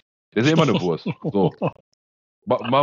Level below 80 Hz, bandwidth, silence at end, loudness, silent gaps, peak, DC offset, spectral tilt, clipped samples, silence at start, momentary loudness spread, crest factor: -62 dBFS; 7.6 kHz; 0 s; -22 LUFS; 1.80-2.42 s; -4 dBFS; under 0.1%; -6.5 dB/octave; under 0.1%; 0.35 s; 11 LU; 16 dB